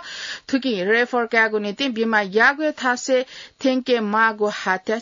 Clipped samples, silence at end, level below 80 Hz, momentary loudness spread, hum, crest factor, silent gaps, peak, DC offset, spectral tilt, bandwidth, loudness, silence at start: under 0.1%; 0 s; -68 dBFS; 7 LU; none; 16 dB; none; -6 dBFS; under 0.1%; -3.5 dB/octave; 7.8 kHz; -20 LUFS; 0 s